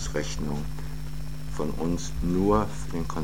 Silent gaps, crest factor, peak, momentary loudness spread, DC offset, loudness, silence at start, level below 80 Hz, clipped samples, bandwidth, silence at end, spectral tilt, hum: none; 20 dB; -10 dBFS; 13 LU; 2%; -30 LUFS; 0 s; -36 dBFS; under 0.1%; 17 kHz; 0 s; -6 dB/octave; none